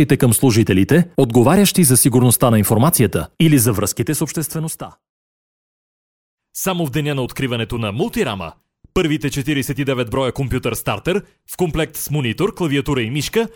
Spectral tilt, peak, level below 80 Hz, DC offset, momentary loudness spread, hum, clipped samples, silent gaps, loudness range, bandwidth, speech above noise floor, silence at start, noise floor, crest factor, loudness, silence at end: -5 dB/octave; -2 dBFS; -40 dBFS; under 0.1%; 10 LU; none; under 0.1%; 5.09-6.38 s; 11 LU; 18 kHz; over 74 dB; 0 s; under -90 dBFS; 16 dB; -17 LUFS; 0.05 s